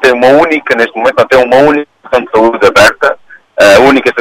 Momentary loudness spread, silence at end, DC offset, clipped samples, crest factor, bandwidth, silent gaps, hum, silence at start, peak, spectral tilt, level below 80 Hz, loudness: 9 LU; 0 s; under 0.1%; 2%; 6 dB; 16.5 kHz; none; none; 0 s; 0 dBFS; -4 dB/octave; -40 dBFS; -7 LUFS